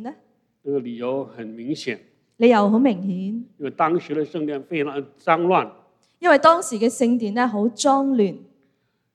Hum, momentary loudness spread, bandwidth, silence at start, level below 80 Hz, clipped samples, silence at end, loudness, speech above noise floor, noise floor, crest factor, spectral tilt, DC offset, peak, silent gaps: none; 15 LU; 13.5 kHz; 0 s; -78 dBFS; under 0.1%; 0.75 s; -21 LUFS; 48 dB; -68 dBFS; 20 dB; -5 dB/octave; under 0.1%; 0 dBFS; none